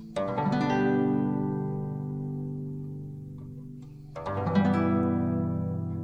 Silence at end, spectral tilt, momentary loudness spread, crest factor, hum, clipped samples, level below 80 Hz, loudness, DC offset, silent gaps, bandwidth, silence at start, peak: 0 s; -9 dB/octave; 17 LU; 16 dB; none; under 0.1%; -56 dBFS; -29 LUFS; under 0.1%; none; 8.6 kHz; 0 s; -12 dBFS